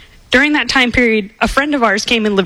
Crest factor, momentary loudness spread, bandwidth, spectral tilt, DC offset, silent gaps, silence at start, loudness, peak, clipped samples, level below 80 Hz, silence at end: 14 dB; 4 LU; 15.5 kHz; -3.5 dB/octave; under 0.1%; none; 0.3 s; -13 LUFS; 0 dBFS; under 0.1%; -34 dBFS; 0 s